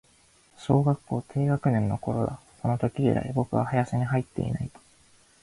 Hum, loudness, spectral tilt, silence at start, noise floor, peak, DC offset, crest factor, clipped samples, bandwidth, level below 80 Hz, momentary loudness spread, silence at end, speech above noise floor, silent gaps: none; -27 LUFS; -8.5 dB/octave; 0.6 s; -60 dBFS; -8 dBFS; under 0.1%; 18 dB; under 0.1%; 11.5 kHz; -52 dBFS; 8 LU; 0.75 s; 35 dB; none